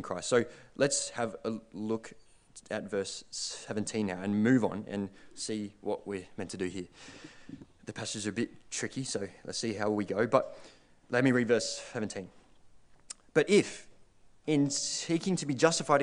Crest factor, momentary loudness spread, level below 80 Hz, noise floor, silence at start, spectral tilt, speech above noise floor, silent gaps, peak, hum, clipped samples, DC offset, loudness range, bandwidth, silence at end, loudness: 24 dB; 18 LU; -68 dBFS; -58 dBFS; 0 s; -4 dB/octave; 26 dB; none; -10 dBFS; none; under 0.1%; under 0.1%; 7 LU; 10 kHz; 0 s; -32 LUFS